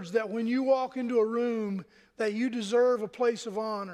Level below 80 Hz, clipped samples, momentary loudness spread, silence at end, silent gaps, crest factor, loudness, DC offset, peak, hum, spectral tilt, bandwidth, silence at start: -76 dBFS; under 0.1%; 8 LU; 0 s; none; 16 dB; -29 LUFS; under 0.1%; -14 dBFS; none; -5.5 dB/octave; 11 kHz; 0 s